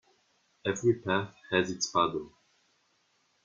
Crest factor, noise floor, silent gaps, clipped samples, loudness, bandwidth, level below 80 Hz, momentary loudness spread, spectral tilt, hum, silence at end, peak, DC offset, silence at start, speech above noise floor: 22 dB; -72 dBFS; none; under 0.1%; -30 LUFS; 7.4 kHz; -68 dBFS; 9 LU; -4 dB/octave; none; 1.15 s; -12 dBFS; under 0.1%; 0.65 s; 42 dB